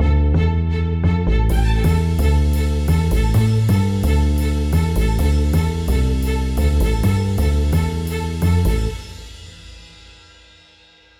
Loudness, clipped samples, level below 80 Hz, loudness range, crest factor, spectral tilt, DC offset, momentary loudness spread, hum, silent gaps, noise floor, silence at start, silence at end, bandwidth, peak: -18 LUFS; under 0.1%; -20 dBFS; 4 LU; 12 dB; -7 dB/octave; under 0.1%; 6 LU; none; none; -50 dBFS; 0 s; 1.35 s; 16 kHz; -6 dBFS